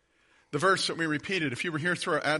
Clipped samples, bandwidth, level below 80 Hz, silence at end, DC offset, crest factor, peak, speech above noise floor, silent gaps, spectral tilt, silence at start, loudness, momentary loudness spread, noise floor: under 0.1%; 11.5 kHz; -68 dBFS; 0 s; under 0.1%; 18 dB; -12 dBFS; 37 dB; none; -4 dB/octave; 0.5 s; -28 LUFS; 5 LU; -66 dBFS